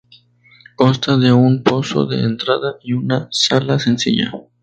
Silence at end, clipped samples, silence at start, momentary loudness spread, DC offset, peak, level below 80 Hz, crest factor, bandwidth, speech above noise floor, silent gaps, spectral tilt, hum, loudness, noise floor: 0.2 s; under 0.1%; 0.8 s; 7 LU; under 0.1%; 0 dBFS; -54 dBFS; 16 dB; 9 kHz; 34 dB; none; -5.5 dB/octave; none; -16 LUFS; -50 dBFS